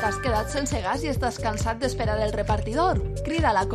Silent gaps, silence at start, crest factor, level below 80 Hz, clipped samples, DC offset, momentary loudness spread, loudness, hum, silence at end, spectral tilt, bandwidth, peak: none; 0 s; 16 dB; -32 dBFS; under 0.1%; under 0.1%; 4 LU; -25 LUFS; none; 0 s; -5 dB/octave; 15 kHz; -8 dBFS